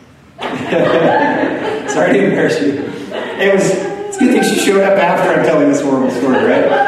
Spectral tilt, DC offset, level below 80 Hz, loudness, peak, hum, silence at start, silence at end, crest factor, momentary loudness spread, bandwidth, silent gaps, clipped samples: -5 dB/octave; under 0.1%; -54 dBFS; -13 LUFS; 0 dBFS; none; 0.4 s; 0 s; 12 dB; 10 LU; 13.5 kHz; none; under 0.1%